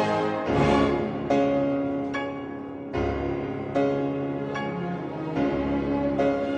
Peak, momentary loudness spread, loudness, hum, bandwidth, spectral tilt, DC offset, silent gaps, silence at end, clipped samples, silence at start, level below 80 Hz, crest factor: -8 dBFS; 9 LU; -26 LUFS; none; 9 kHz; -7.5 dB/octave; under 0.1%; none; 0 s; under 0.1%; 0 s; -44 dBFS; 16 dB